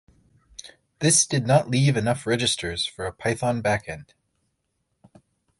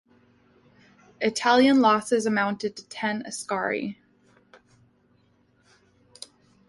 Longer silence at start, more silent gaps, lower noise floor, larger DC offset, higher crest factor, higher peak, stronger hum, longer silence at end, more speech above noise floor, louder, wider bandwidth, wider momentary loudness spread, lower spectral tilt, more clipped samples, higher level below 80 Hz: second, 0.6 s vs 1.2 s; neither; first, -75 dBFS vs -64 dBFS; neither; about the same, 20 dB vs 20 dB; about the same, -6 dBFS vs -6 dBFS; neither; second, 1.55 s vs 2.75 s; first, 52 dB vs 41 dB; about the same, -22 LUFS vs -24 LUFS; about the same, 12 kHz vs 11.5 kHz; about the same, 22 LU vs 24 LU; about the same, -4 dB/octave vs -4 dB/octave; neither; first, -52 dBFS vs -70 dBFS